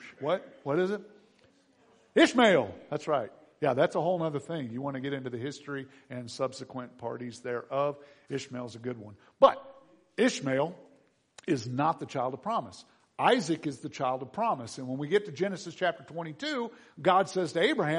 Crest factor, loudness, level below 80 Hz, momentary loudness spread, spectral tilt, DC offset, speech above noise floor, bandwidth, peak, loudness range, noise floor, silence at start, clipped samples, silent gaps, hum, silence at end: 24 dB; -30 LUFS; -74 dBFS; 16 LU; -5 dB/octave; under 0.1%; 35 dB; 10.5 kHz; -6 dBFS; 8 LU; -65 dBFS; 0 s; under 0.1%; none; none; 0 s